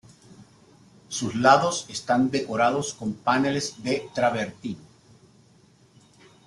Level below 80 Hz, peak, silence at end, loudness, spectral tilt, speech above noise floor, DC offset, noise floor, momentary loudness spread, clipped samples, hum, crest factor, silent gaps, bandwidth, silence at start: -64 dBFS; -4 dBFS; 1.65 s; -24 LUFS; -4 dB/octave; 33 dB; under 0.1%; -57 dBFS; 14 LU; under 0.1%; none; 22 dB; none; 12 kHz; 0.4 s